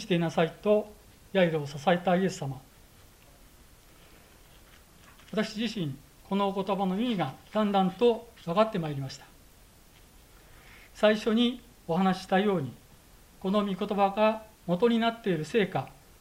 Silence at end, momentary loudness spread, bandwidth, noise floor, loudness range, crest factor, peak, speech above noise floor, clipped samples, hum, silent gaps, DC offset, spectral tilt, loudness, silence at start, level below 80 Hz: 0.3 s; 12 LU; 16 kHz; -56 dBFS; 8 LU; 20 dB; -10 dBFS; 29 dB; under 0.1%; none; none; under 0.1%; -6.5 dB/octave; -28 LUFS; 0 s; -60 dBFS